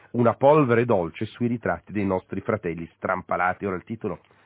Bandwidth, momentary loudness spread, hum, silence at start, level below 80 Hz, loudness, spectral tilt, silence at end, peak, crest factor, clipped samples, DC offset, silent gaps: 4 kHz; 13 LU; none; 0.15 s; -52 dBFS; -24 LUFS; -11.5 dB/octave; 0.3 s; -6 dBFS; 18 dB; under 0.1%; under 0.1%; none